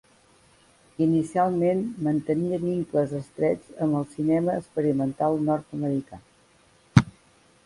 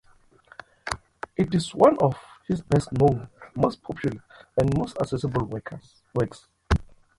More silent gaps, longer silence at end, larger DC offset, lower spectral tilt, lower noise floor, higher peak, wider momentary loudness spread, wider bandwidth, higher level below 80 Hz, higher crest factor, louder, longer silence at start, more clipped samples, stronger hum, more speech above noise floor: neither; first, 0.55 s vs 0.35 s; neither; about the same, -8 dB/octave vs -7 dB/octave; about the same, -59 dBFS vs -56 dBFS; first, 0 dBFS vs -4 dBFS; second, 6 LU vs 16 LU; about the same, 11.5 kHz vs 11.5 kHz; second, -52 dBFS vs -40 dBFS; about the same, 26 dB vs 22 dB; about the same, -25 LUFS vs -25 LUFS; first, 1 s vs 0.85 s; neither; neither; about the same, 34 dB vs 32 dB